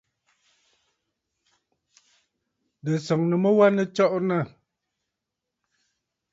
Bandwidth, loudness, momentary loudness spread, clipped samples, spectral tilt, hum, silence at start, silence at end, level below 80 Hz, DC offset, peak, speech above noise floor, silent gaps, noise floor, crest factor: 7.8 kHz; -22 LUFS; 11 LU; under 0.1%; -7.5 dB/octave; none; 2.85 s; 1.85 s; -74 dBFS; under 0.1%; -6 dBFS; 63 dB; none; -84 dBFS; 20 dB